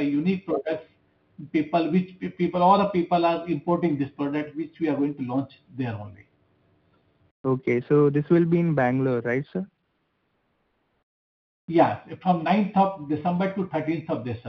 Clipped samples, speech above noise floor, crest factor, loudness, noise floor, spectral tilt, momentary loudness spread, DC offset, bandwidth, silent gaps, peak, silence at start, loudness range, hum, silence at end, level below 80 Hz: under 0.1%; 49 dB; 20 dB; -24 LUFS; -72 dBFS; -9.5 dB/octave; 12 LU; under 0.1%; 6 kHz; 7.31-7.44 s, 11.03-11.68 s; -6 dBFS; 0 s; 6 LU; none; 0 s; -64 dBFS